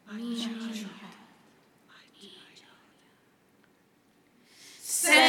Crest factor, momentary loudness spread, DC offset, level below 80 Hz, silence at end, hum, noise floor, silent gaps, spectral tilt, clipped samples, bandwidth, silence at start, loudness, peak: 26 dB; 25 LU; under 0.1%; -90 dBFS; 0 s; none; -65 dBFS; none; -0.5 dB/octave; under 0.1%; 18.5 kHz; 0.1 s; -30 LUFS; -6 dBFS